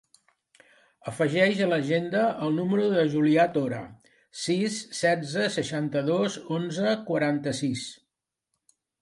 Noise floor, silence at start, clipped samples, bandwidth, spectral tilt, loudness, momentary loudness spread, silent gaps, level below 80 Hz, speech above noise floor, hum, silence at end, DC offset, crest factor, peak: -83 dBFS; 1.05 s; under 0.1%; 11.5 kHz; -5.5 dB/octave; -26 LUFS; 12 LU; none; -70 dBFS; 57 dB; none; 1.1 s; under 0.1%; 18 dB; -8 dBFS